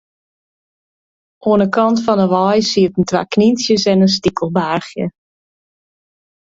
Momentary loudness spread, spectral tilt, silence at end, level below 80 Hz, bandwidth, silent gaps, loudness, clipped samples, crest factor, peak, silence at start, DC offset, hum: 8 LU; -5.5 dB/octave; 1.5 s; -52 dBFS; 7.8 kHz; none; -15 LUFS; under 0.1%; 16 dB; 0 dBFS; 1.45 s; under 0.1%; none